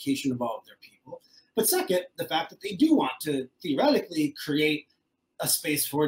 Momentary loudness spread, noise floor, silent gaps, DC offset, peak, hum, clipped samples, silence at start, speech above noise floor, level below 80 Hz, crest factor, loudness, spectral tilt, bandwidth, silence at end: 11 LU; -57 dBFS; none; under 0.1%; -10 dBFS; none; under 0.1%; 0 s; 30 dB; -72 dBFS; 18 dB; -27 LUFS; -3.5 dB/octave; 16.5 kHz; 0 s